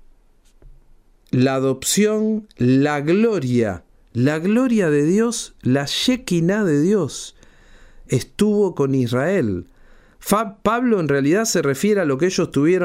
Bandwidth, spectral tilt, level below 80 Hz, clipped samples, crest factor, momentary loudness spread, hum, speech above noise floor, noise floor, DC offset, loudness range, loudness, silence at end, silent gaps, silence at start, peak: 16 kHz; -5.5 dB/octave; -50 dBFS; under 0.1%; 18 dB; 7 LU; none; 35 dB; -53 dBFS; under 0.1%; 3 LU; -19 LUFS; 0 s; none; 0.65 s; -2 dBFS